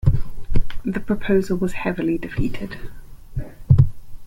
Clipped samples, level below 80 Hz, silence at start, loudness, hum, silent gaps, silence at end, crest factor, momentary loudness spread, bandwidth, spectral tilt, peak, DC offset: under 0.1%; -28 dBFS; 0.05 s; -22 LUFS; none; none; 0 s; 16 dB; 17 LU; 10 kHz; -8.5 dB/octave; -2 dBFS; under 0.1%